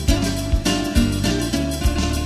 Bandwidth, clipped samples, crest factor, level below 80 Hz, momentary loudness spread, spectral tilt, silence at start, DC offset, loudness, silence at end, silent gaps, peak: 13.5 kHz; under 0.1%; 16 dB; -24 dBFS; 2 LU; -5 dB/octave; 0 s; under 0.1%; -20 LUFS; 0 s; none; -4 dBFS